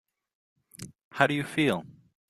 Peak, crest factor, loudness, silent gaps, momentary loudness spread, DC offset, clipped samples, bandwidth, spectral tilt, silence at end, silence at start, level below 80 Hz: -4 dBFS; 26 dB; -27 LUFS; 1.04-1.11 s; 21 LU; under 0.1%; under 0.1%; 14.5 kHz; -5.5 dB/octave; 0.4 s; 0.8 s; -68 dBFS